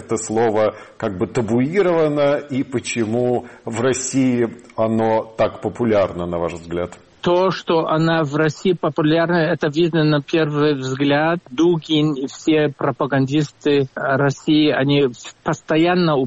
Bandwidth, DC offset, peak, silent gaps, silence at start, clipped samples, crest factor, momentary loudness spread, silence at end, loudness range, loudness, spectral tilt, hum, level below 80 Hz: 8.8 kHz; under 0.1%; -6 dBFS; none; 0 s; under 0.1%; 12 dB; 7 LU; 0 s; 2 LU; -19 LUFS; -6 dB/octave; none; -52 dBFS